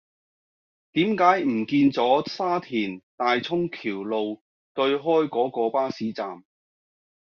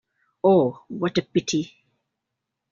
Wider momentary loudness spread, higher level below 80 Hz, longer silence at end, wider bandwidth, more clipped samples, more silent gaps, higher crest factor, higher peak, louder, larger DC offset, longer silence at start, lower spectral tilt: first, 12 LU vs 9 LU; second, -70 dBFS vs -62 dBFS; second, 0.8 s vs 1.05 s; about the same, 6.8 kHz vs 7.4 kHz; neither; first, 3.03-3.18 s, 4.41-4.75 s vs none; about the same, 20 dB vs 18 dB; about the same, -6 dBFS vs -6 dBFS; about the same, -24 LUFS vs -23 LUFS; neither; first, 0.95 s vs 0.45 s; second, -3.5 dB/octave vs -5.5 dB/octave